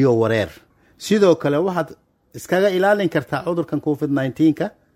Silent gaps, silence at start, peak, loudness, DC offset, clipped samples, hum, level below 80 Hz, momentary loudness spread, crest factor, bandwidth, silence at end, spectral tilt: none; 0 s; -2 dBFS; -19 LUFS; under 0.1%; under 0.1%; none; -58 dBFS; 10 LU; 16 dB; 16 kHz; 0.25 s; -6.5 dB/octave